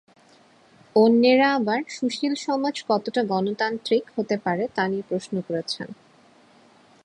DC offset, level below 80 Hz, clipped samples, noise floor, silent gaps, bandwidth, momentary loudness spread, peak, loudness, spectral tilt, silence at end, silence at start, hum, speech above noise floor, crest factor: under 0.1%; -70 dBFS; under 0.1%; -55 dBFS; none; 10.5 kHz; 11 LU; -6 dBFS; -23 LUFS; -5.5 dB/octave; 1.1 s; 0.95 s; none; 33 dB; 18 dB